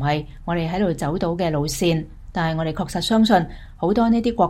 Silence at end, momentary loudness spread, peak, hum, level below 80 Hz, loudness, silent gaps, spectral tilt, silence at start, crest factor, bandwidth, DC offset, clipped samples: 0 s; 8 LU; -4 dBFS; none; -38 dBFS; -21 LUFS; none; -6 dB/octave; 0 s; 16 dB; 16.5 kHz; under 0.1%; under 0.1%